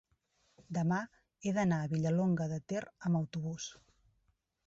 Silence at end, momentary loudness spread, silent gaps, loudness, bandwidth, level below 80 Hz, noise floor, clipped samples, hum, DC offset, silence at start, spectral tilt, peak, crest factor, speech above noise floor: 0.95 s; 10 LU; none; -35 LUFS; 7.8 kHz; -70 dBFS; -77 dBFS; under 0.1%; none; under 0.1%; 0.7 s; -7 dB/octave; -22 dBFS; 14 dB; 43 dB